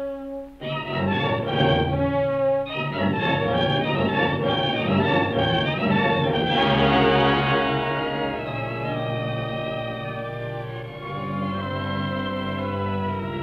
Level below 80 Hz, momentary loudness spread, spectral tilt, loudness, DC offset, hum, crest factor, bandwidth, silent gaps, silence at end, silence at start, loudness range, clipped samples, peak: -46 dBFS; 11 LU; -8 dB/octave; -23 LUFS; under 0.1%; none; 16 dB; 6.6 kHz; none; 0 s; 0 s; 8 LU; under 0.1%; -6 dBFS